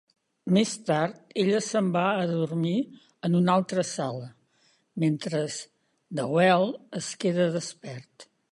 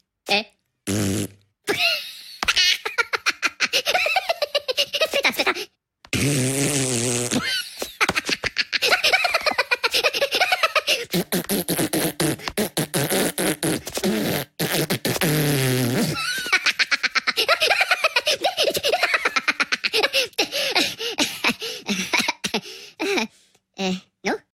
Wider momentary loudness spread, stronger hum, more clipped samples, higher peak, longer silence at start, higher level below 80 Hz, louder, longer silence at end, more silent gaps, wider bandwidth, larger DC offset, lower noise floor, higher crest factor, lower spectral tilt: first, 16 LU vs 8 LU; neither; neither; second, -8 dBFS vs -4 dBFS; first, 0.45 s vs 0.25 s; second, -72 dBFS vs -54 dBFS; second, -26 LUFS vs -21 LUFS; first, 0.3 s vs 0.15 s; neither; second, 11.5 kHz vs 17 kHz; neither; first, -67 dBFS vs -58 dBFS; about the same, 20 dB vs 20 dB; first, -5.5 dB/octave vs -2.5 dB/octave